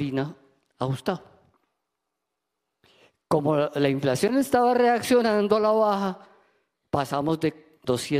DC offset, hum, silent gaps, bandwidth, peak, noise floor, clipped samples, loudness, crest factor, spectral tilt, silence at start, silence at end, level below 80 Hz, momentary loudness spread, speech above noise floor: under 0.1%; none; none; 15.5 kHz; -6 dBFS; -82 dBFS; under 0.1%; -24 LUFS; 20 dB; -6 dB/octave; 0 s; 0 s; -62 dBFS; 11 LU; 59 dB